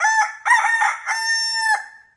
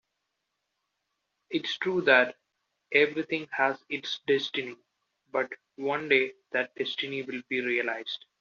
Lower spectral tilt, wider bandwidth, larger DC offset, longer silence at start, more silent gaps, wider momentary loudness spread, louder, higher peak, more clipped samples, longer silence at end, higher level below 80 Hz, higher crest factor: second, 5.5 dB/octave vs -1 dB/octave; first, 11.5 kHz vs 7.2 kHz; neither; second, 0 s vs 1.5 s; neither; second, 5 LU vs 12 LU; first, -18 LUFS vs -28 LUFS; about the same, -4 dBFS vs -6 dBFS; neither; about the same, 0.2 s vs 0.25 s; about the same, -78 dBFS vs -78 dBFS; second, 16 dB vs 24 dB